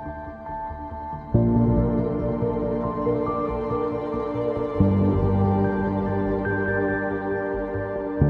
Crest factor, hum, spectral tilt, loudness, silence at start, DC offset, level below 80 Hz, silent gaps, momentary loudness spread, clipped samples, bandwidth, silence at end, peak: 16 dB; none; -11 dB/octave; -24 LUFS; 0 s; under 0.1%; -36 dBFS; none; 12 LU; under 0.1%; 4.7 kHz; 0 s; -6 dBFS